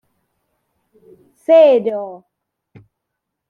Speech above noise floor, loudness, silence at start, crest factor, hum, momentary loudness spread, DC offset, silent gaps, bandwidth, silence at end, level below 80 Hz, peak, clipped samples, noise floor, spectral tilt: 64 dB; -13 LUFS; 1.5 s; 16 dB; none; 20 LU; under 0.1%; none; 4.8 kHz; 1.35 s; -74 dBFS; -2 dBFS; under 0.1%; -78 dBFS; -6.5 dB/octave